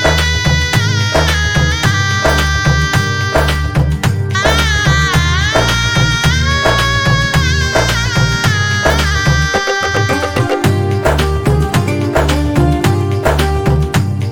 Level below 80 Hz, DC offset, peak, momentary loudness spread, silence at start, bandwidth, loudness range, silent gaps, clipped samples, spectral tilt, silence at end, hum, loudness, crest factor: -20 dBFS; under 0.1%; 0 dBFS; 3 LU; 0 s; 18.5 kHz; 2 LU; none; under 0.1%; -4.5 dB/octave; 0 s; none; -12 LUFS; 12 dB